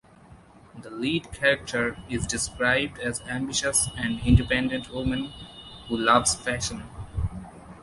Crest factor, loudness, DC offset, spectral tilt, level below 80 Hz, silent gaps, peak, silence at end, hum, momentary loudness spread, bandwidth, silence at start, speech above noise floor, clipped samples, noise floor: 22 dB; -25 LUFS; under 0.1%; -3.5 dB/octave; -38 dBFS; none; -4 dBFS; 0 s; none; 18 LU; 12 kHz; 0.3 s; 26 dB; under 0.1%; -51 dBFS